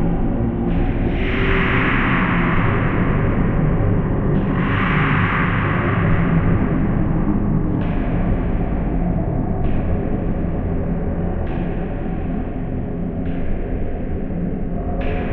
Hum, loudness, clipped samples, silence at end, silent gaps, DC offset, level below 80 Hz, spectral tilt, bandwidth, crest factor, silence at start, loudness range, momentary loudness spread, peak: none; -20 LUFS; under 0.1%; 0 s; none; under 0.1%; -24 dBFS; -10.5 dB/octave; 4.1 kHz; 14 dB; 0 s; 7 LU; 8 LU; -4 dBFS